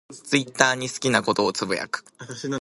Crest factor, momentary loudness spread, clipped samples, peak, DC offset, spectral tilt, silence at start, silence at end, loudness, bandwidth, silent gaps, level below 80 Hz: 24 dB; 12 LU; under 0.1%; 0 dBFS; under 0.1%; -3 dB/octave; 0.1 s; 0 s; -23 LUFS; 16 kHz; none; -64 dBFS